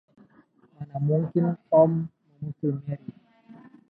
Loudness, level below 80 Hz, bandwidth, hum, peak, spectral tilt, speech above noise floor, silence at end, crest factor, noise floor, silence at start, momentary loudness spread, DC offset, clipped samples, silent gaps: -25 LUFS; -66 dBFS; 2.9 kHz; none; -6 dBFS; -13.5 dB/octave; 35 dB; 0.4 s; 20 dB; -59 dBFS; 0.8 s; 19 LU; under 0.1%; under 0.1%; none